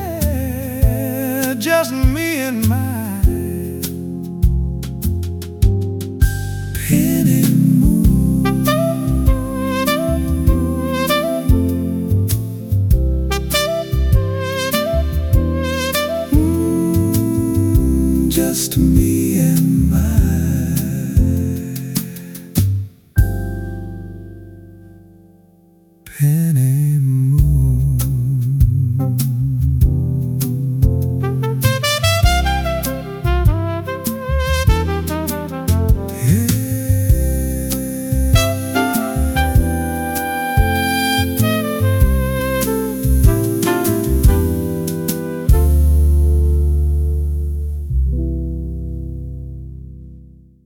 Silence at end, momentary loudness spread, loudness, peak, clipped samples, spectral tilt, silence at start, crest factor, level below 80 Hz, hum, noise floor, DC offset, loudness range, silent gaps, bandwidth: 0.4 s; 9 LU; -17 LUFS; 0 dBFS; under 0.1%; -6 dB/octave; 0 s; 16 dB; -22 dBFS; none; -50 dBFS; under 0.1%; 5 LU; none; 18 kHz